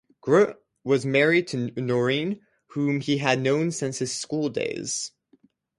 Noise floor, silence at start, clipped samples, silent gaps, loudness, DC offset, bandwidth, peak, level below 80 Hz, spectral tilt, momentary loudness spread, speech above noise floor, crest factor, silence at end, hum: -62 dBFS; 0.25 s; under 0.1%; none; -24 LUFS; under 0.1%; 11.5 kHz; -4 dBFS; -68 dBFS; -4.5 dB/octave; 10 LU; 38 dB; 20 dB; 0.7 s; none